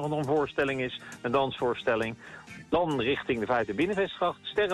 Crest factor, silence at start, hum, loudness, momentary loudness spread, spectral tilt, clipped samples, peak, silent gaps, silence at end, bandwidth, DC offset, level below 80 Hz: 14 dB; 0 s; none; -29 LUFS; 8 LU; -6 dB/octave; under 0.1%; -16 dBFS; none; 0 s; 12.5 kHz; under 0.1%; -58 dBFS